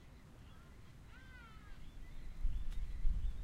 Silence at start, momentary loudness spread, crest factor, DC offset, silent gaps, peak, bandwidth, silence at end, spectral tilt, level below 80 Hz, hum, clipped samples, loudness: 0 s; 16 LU; 18 dB; under 0.1%; none; -22 dBFS; 6.4 kHz; 0 s; -6 dB/octave; -42 dBFS; none; under 0.1%; -50 LUFS